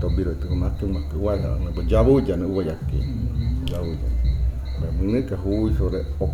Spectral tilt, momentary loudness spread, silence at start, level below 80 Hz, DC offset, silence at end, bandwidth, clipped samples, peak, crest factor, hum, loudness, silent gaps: -9 dB/octave; 7 LU; 0 s; -26 dBFS; under 0.1%; 0 s; 7.2 kHz; under 0.1%; -6 dBFS; 16 dB; none; -24 LUFS; none